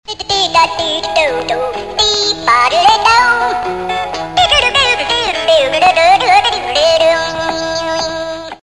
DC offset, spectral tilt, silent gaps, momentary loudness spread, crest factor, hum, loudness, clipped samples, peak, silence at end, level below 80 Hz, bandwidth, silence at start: 0.6%; -1.5 dB/octave; none; 9 LU; 12 dB; none; -11 LUFS; under 0.1%; 0 dBFS; 0.05 s; -40 dBFS; 12.5 kHz; 0.1 s